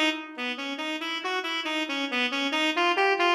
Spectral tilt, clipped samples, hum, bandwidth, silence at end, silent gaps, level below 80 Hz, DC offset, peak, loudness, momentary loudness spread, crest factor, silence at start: -0.5 dB/octave; under 0.1%; none; 14 kHz; 0 s; none; -82 dBFS; under 0.1%; -10 dBFS; -26 LUFS; 8 LU; 18 dB; 0 s